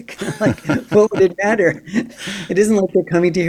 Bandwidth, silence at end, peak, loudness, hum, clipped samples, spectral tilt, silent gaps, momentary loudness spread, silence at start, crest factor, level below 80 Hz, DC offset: 14.5 kHz; 0 s; -2 dBFS; -17 LUFS; none; under 0.1%; -6 dB/octave; none; 9 LU; 0 s; 16 dB; -50 dBFS; under 0.1%